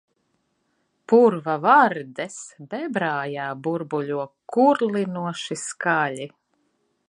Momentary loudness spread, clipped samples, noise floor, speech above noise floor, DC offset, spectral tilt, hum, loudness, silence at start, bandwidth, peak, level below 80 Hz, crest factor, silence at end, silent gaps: 15 LU; under 0.1%; -71 dBFS; 49 dB; under 0.1%; -5 dB/octave; none; -22 LUFS; 1.1 s; 11 kHz; -2 dBFS; -78 dBFS; 20 dB; 0.8 s; none